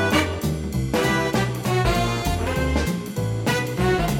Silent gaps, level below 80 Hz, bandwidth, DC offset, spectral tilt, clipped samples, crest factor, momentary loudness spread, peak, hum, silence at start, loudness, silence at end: none; -32 dBFS; 17.5 kHz; under 0.1%; -5.5 dB/octave; under 0.1%; 16 dB; 5 LU; -6 dBFS; none; 0 s; -23 LUFS; 0 s